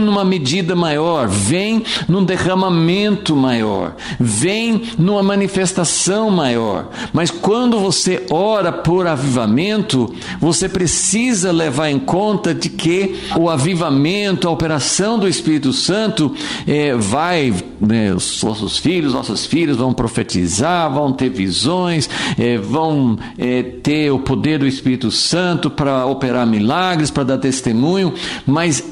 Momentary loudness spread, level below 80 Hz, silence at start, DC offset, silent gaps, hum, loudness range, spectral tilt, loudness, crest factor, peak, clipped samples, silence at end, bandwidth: 4 LU; -42 dBFS; 0 s; under 0.1%; none; none; 1 LU; -4.5 dB/octave; -16 LUFS; 10 dB; -4 dBFS; under 0.1%; 0 s; 11.5 kHz